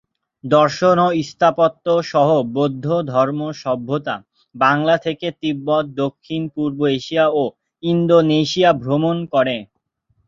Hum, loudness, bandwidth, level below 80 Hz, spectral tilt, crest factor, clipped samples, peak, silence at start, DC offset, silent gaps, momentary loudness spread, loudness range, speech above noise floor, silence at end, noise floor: none; -18 LUFS; 7.6 kHz; -58 dBFS; -6.5 dB/octave; 16 dB; under 0.1%; -2 dBFS; 0.45 s; under 0.1%; none; 10 LU; 3 LU; 48 dB; 0.65 s; -65 dBFS